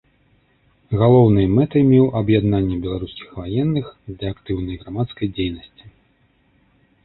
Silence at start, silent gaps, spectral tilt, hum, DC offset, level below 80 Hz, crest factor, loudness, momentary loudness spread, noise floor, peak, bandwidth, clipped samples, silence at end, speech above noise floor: 0.9 s; none; -13 dB/octave; none; under 0.1%; -40 dBFS; 18 dB; -19 LUFS; 15 LU; -60 dBFS; -2 dBFS; 4.2 kHz; under 0.1%; 1.15 s; 42 dB